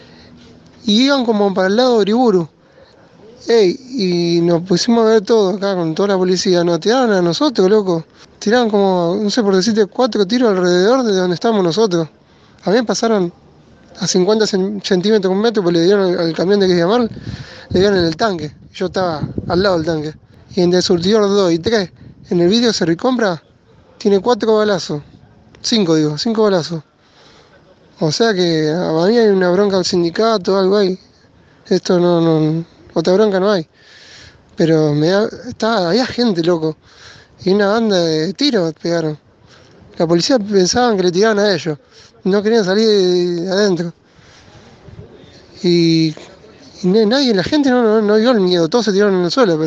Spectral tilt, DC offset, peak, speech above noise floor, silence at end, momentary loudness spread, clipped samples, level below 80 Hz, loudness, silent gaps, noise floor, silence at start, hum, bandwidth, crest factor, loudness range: -5.5 dB/octave; under 0.1%; 0 dBFS; 34 dB; 0 s; 9 LU; under 0.1%; -50 dBFS; -15 LUFS; none; -48 dBFS; 0.85 s; none; 8.2 kHz; 14 dB; 3 LU